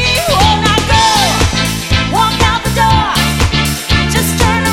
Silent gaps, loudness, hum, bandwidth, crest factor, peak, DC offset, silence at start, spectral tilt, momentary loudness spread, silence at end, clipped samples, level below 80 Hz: none; -11 LUFS; none; 17 kHz; 12 dB; 0 dBFS; under 0.1%; 0 s; -3.5 dB/octave; 4 LU; 0 s; under 0.1%; -20 dBFS